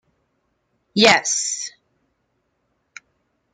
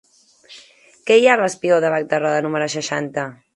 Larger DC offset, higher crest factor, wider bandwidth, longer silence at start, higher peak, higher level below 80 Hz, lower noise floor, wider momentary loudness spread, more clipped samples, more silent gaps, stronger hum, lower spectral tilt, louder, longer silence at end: neither; first, 24 dB vs 18 dB; about the same, 11 kHz vs 11.5 kHz; first, 0.95 s vs 0.5 s; about the same, 0 dBFS vs 0 dBFS; first, -64 dBFS vs -70 dBFS; first, -71 dBFS vs -49 dBFS; about the same, 14 LU vs 12 LU; neither; neither; neither; second, -1.5 dB/octave vs -4 dB/octave; about the same, -17 LUFS vs -18 LUFS; first, 1.85 s vs 0.2 s